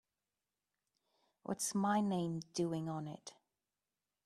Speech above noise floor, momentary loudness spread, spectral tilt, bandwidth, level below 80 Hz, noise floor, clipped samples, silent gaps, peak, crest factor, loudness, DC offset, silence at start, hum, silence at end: over 52 dB; 18 LU; -5 dB/octave; 14.5 kHz; -80 dBFS; under -90 dBFS; under 0.1%; none; -22 dBFS; 20 dB; -38 LUFS; under 0.1%; 1.5 s; 50 Hz at -75 dBFS; 0.95 s